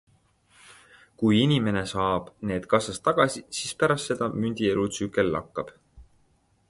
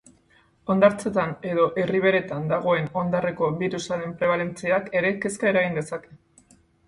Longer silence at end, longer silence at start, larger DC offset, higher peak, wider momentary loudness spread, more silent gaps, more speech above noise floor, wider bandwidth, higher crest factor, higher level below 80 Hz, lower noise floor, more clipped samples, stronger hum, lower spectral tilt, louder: about the same, 0.65 s vs 0.7 s; about the same, 0.7 s vs 0.65 s; neither; about the same, -6 dBFS vs -4 dBFS; about the same, 9 LU vs 8 LU; neither; about the same, 40 dB vs 37 dB; about the same, 11.5 kHz vs 11.5 kHz; about the same, 22 dB vs 20 dB; first, -54 dBFS vs -60 dBFS; first, -65 dBFS vs -60 dBFS; neither; neither; about the same, -5 dB/octave vs -6 dB/octave; about the same, -26 LUFS vs -24 LUFS